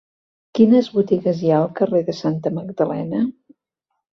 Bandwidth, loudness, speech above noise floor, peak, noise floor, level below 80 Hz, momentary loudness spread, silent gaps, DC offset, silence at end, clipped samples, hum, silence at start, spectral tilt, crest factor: 6.4 kHz; -19 LUFS; 59 dB; -2 dBFS; -77 dBFS; -62 dBFS; 10 LU; none; under 0.1%; 0.8 s; under 0.1%; none; 0.55 s; -8.5 dB/octave; 18 dB